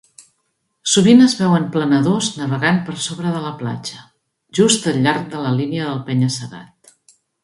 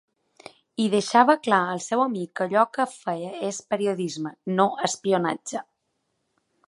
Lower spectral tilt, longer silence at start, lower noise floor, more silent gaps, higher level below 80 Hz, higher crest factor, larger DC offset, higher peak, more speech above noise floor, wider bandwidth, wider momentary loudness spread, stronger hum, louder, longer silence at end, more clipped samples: about the same, -4.5 dB/octave vs -4.5 dB/octave; about the same, 0.85 s vs 0.8 s; second, -70 dBFS vs -75 dBFS; neither; first, -58 dBFS vs -76 dBFS; about the same, 18 dB vs 22 dB; neither; about the same, 0 dBFS vs -2 dBFS; about the same, 53 dB vs 52 dB; about the same, 11.5 kHz vs 11.5 kHz; first, 15 LU vs 12 LU; neither; first, -17 LUFS vs -24 LUFS; second, 0.8 s vs 1.05 s; neither